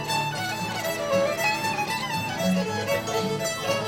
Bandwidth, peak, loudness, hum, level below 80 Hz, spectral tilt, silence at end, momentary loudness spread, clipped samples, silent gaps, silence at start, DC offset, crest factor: 18.5 kHz; -12 dBFS; -26 LUFS; none; -56 dBFS; -4 dB/octave; 0 s; 4 LU; under 0.1%; none; 0 s; under 0.1%; 16 dB